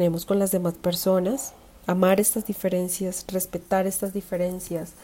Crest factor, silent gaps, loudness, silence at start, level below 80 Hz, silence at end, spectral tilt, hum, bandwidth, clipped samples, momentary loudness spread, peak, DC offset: 18 dB; none; -25 LUFS; 0 s; -54 dBFS; 0 s; -5 dB/octave; none; 16.5 kHz; under 0.1%; 9 LU; -8 dBFS; under 0.1%